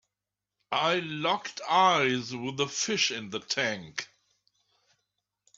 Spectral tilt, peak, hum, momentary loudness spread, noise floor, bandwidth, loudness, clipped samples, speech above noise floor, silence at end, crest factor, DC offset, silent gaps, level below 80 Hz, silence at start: -2.5 dB/octave; -10 dBFS; 50 Hz at -65 dBFS; 13 LU; -89 dBFS; 8.4 kHz; -28 LUFS; under 0.1%; 60 dB; 1.5 s; 20 dB; under 0.1%; none; -74 dBFS; 0.7 s